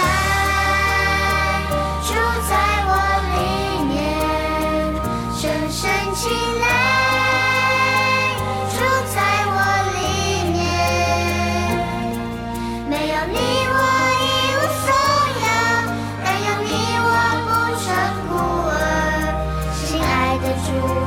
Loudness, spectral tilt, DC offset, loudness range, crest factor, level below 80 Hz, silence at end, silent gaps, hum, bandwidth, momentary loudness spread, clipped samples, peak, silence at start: -18 LUFS; -4 dB/octave; under 0.1%; 3 LU; 12 dB; -32 dBFS; 0 s; none; none; 17 kHz; 6 LU; under 0.1%; -6 dBFS; 0 s